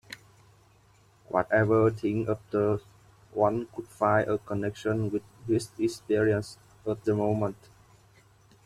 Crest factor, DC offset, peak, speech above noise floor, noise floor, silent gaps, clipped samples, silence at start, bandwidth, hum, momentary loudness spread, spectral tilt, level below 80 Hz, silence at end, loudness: 20 dB; under 0.1%; -8 dBFS; 33 dB; -61 dBFS; none; under 0.1%; 0.1 s; 13.5 kHz; none; 11 LU; -7 dB/octave; -60 dBFS; 1.15 s; -28 LUFS